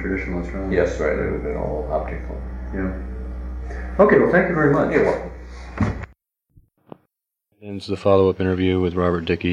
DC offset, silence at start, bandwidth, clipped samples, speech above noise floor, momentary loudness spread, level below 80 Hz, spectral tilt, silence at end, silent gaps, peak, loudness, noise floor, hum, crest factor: under 0.1%; 0 s; 9.6 kHz; under 0.1%; 53 dB; 16 LU; -34 dBFS; -8 dB/octave; 0 s; none; -2 dBFS; -21 LUFS; -73 dBFS; none; 20 dB